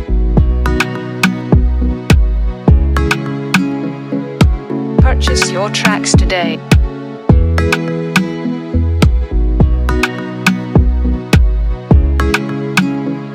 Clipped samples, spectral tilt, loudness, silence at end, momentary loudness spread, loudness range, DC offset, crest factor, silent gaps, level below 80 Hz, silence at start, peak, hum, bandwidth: under 0.1%; -5.5 dB/octave; -14 LUFS; 0 s; 6 LU; 1 LU; under 0.1%; 12 dB; none; -16 dBFS; 0 s; 0 dBFS; none; 15 kHz